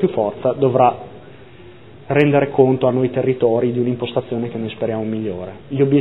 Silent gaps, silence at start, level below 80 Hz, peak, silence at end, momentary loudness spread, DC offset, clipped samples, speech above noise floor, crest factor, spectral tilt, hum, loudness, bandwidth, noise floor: none; 0 s; -56 dBFS; 0 dBFS; 0 s; 11 LU; 0.5%; under 0.1%; 24 dB; 18 dB; -11.5 dB/octave; none; -18 LUFS; 4.1 kHz; -41 dBFS